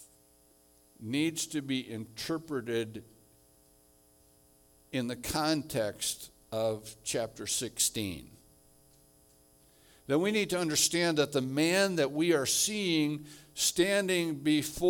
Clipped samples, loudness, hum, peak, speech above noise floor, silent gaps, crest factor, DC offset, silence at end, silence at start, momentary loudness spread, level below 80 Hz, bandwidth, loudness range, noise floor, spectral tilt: under 0.1%; -31 LUFS; none; -12 dBFS; 33 dB; none; 20 dB; under 0.1%; 0 s; 0 s; 12 LU; -62 dBFS; 18 kHz; 9 LU; -64 dBFS; -3 dB/octave